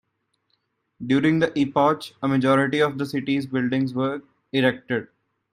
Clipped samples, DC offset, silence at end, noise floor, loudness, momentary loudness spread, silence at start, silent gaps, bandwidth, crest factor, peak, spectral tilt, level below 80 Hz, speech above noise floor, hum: under 0.1%; under 0.1%; 0.45 s; -73 dBFS; -22 LUFS; 9 LU; 1 s; none; 14 kHz; 18 dB; -6 dBFS; -7 dB/octave; -64 dBFS; 52 dB; none